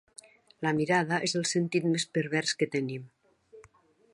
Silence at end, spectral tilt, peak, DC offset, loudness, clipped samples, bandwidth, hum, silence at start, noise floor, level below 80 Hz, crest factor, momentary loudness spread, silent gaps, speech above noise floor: 0.55 s; -4.5 dB/octave; -12 dBFS; under 0.1%; -29 LUFS; under 0.1%; 11.5 kHz; none; 0.6 s; -62 dBFS; -72 dBFS; 20 dB; 7 LU; none; 33 dB